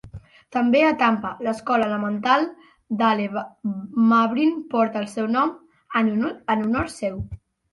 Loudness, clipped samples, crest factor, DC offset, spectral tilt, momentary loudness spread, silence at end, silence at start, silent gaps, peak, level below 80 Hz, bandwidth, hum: -22 LUFS; under 0.1%; 16 dB; under 0.1%; -6 dB/octave; 11 LU; 0.35 s; 0.05 s; none; -6 dBFS; -50 dBFS; 11.5 kHz; none